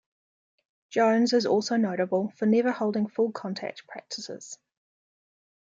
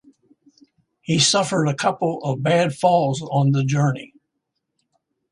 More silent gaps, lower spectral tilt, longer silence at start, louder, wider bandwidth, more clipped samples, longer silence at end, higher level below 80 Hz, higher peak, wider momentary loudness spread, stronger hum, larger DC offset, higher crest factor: neither; about the same, -5 dB/octave vs -4.5 dB/octave; second, 0.9 s vs 1.1 s; second, -26 LUFS vs -19 LUFS; second, 7.8 kHz vs 11.5 kHz; neither; second, 1.1 s vs 1.25 s; second, -80 dBFS vs -60 dBFS; second, -12 dBFS vs -4 dBFS; first, 16 LU vs 7 LU; neither; neither; about the same, 16 dB vs 18 dB